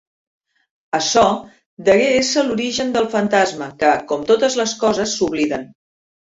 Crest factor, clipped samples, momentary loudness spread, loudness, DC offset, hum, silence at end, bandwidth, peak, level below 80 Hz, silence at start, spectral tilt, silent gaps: 16 dB; under 0.1%; 7 LU; -17 LUFS; under 0.1%; none; 0.65 s; 8 kHz; -2 dBFS; -54 dBFS; 0.95 s; -3 dB/octave; 1.66-1.77 s